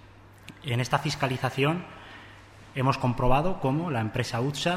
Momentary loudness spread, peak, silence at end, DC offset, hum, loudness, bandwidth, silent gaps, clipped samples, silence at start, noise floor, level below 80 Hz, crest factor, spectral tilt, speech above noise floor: 20 LU; -8 dBFS; 0 s; under 0.1%; none; -27 LUFS; 15 kHz; none; under 0.1%; 0.05 s; -49 dBFS; -40 dBFS; 18 dB; -6 dB/octave; 23 dB